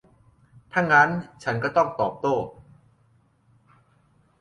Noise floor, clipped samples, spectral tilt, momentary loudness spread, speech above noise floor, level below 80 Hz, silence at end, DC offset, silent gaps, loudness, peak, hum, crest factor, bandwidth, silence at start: -62 dBFS; under 0.1%; -6 dB/octave; 12 LU; 40 dB; -62 dBFS; 1.9 s; under 0.1%; none; -23 LUFS; -4 dBFS; none; 22 dB; 11 kHz; 0.75 s